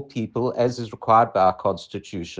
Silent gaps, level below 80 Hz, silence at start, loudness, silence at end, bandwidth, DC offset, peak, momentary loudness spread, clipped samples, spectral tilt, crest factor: none; -56 dBFS; 0 s; -22 LUFS; 0.05 s; 9.4 kHz; under 0.1%; -4 dBFS; 14 LU; under 0.1%; -6.5 dB/octave; 18 dB